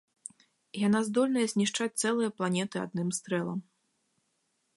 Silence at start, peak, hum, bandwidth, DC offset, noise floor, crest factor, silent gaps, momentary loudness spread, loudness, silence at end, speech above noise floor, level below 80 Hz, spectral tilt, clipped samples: 0.75 s; -16 dBFS; none; 11.5 kHz; under 0.1%; -77 dBFS; 16 dB; none; 15 LU; -30 LUFS; 1.15 s; 47 dB; -76 dBFS; -4.5 dB/octave; under 0.1%